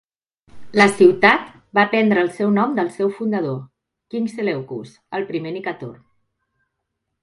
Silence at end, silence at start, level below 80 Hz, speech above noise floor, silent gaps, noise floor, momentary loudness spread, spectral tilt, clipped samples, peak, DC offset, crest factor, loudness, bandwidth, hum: 1.3 s; 0.55 s; -64 dBFS; 59 dB; none; -77 dBFS; 18 LU; -6 dB/octave; under 0.1%; 0 dBFS; under 0.1%; 20 dB; -18 LUFS; 11.5 kHz; none